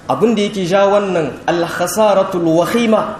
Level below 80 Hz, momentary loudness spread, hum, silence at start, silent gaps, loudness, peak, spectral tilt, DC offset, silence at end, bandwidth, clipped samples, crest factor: -50 dBFS; 5 LU; none; 0.05 s; none; -14 LUFS; 0 dBFS; -5 dB/octave; under 0.1%; 0 s; 15.5 kHz; under 0.1%; 14 dB